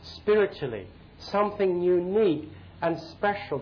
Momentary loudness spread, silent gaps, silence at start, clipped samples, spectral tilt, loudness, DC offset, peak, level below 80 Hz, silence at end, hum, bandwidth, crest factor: 11 LU; none; 0 s; under 0.1%; -7.5 dB/octave; -27 LUFS; under 0.1%; -14 dBFS; -56 dBFS; 0 s; none; 5.4 kHz; 14 dB